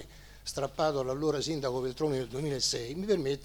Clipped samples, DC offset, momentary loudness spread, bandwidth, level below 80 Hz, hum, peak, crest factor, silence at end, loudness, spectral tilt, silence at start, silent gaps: under 0.1%; under 0.1%; 6 LU; over 20 kHz; -54 dBFS; none; -14 dBFS; 18 dB; 0 s; -32 LUFS; -4.5 dB/octave; 0 s; none